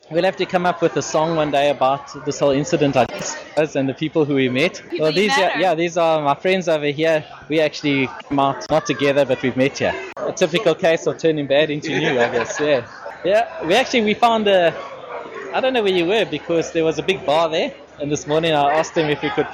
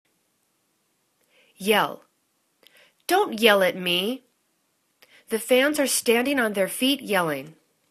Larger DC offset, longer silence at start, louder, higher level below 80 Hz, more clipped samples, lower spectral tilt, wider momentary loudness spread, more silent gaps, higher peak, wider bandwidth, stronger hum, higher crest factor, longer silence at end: neither; second, 0.1 s vs 1.6 s; first, -19 LUFS vs -22 LUFS; first, -54 dBFS vs -72 dBFS; neither; first, -4.5 dB/octave vs -2.5 dB/octave; second, 7 LU vs 13 LU; neither; about the same, -4 dBFS vs -2 dBFS; about the same, 13.5 kHz vs 14 kHz; neither; second, 16 dB vs 24 dB; second, 0 s vs 0.4 s